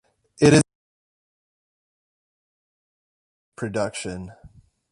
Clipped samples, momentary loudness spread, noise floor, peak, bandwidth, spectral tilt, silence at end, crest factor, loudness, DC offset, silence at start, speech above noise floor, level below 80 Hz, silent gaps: under 0.1%; 19 LU; -51 dBFS; -2 dBFS; 11.5 kHz; -5.5 dB/octave; 0.45 s; 24 dB; -21 LUFS; under 0.1%; 0.4 s; 32 dB; -54 dBFS; 0.75-3.52 s